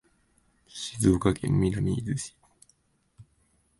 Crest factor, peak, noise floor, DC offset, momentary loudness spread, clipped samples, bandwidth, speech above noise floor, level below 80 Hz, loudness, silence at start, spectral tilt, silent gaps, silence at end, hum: 22 dB; -8 dBFS; -68 dBFS; under 0.1%; 15 LU; under 0.1%; 12 kHz; 43 dB; -46 dBFS; -27 LUFS; 0.75 s; -6 dB/octave; none; 0.6 s; none